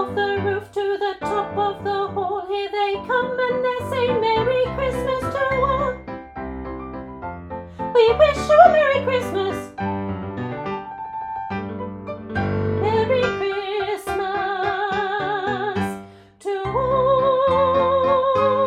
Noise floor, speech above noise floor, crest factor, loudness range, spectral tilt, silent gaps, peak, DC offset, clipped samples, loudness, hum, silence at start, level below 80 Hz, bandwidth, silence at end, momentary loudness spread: -41 dBFS; 23 dB; 20 dB; 7 LU; -6 dB/octave; none; 0 dBFS; under 0.1%; under 0.1%; -21 LUFS; none; 0 s; -44 dBFS; 13.5 kHz; 0 s; 14 LU